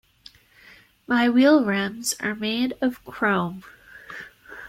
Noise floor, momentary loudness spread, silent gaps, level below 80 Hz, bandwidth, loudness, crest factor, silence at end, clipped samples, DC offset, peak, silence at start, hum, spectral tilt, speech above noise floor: -52 dBFS; 22 LU; none; -62 dBFS; 16 kHz; -22 LUFS; 18 dB; 0 s; under 0.1%; under 0.1%; -6 dBFS; 1.1 s; none; -4 dB/octave; 30 dB